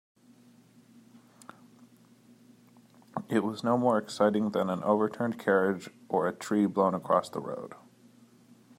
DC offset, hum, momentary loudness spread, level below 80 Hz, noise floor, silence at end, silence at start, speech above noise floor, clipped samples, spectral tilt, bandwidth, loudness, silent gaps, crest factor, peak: under 0.1%; none; 12 LU; -78 dBFS; -59 dBFS; 1.05 s; 3.15 s; 31 dB; under 0.1%; -6.5 dB/octave; 16 kHz; -29 LUFS; none; 20 dB; -10 dBFS